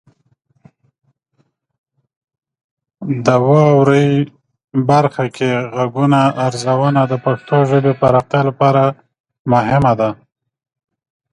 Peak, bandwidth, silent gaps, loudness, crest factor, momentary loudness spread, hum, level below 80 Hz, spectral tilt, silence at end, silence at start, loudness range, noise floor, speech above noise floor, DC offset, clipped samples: 0 dBFS; 10.5 kHz; 9.20-9.24 s, 9.39-9.45 s; -14 LUFS; 16 dB; 9 LU; none; -50 dBFS; -7.5 dB/octave; 1.2 s; 3 s; 3 LU; -63 dBFS; 50 dB; under 0.1%; under 0.1%